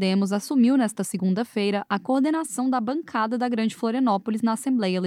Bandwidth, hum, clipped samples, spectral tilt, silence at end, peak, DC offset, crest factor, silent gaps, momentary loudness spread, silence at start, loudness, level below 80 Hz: 15 kHz; none; under 0.1%; -5.5 dB/octave; 0 s; -10 dBFS; under 0.1%; 12 dB; none; 5 LU; 0 s; -24 LUFS; -78 dBFS